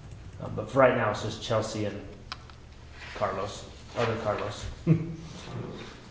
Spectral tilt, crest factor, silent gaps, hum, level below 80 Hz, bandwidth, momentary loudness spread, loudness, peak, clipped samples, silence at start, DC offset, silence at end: -6 dB/octave; 26 dB; none; none; -50 dBFS; 8 kHz; 19 LU; -29 LUFS; -4 dBFS; under 0.1%; 0 s; under 0.1%; 0 s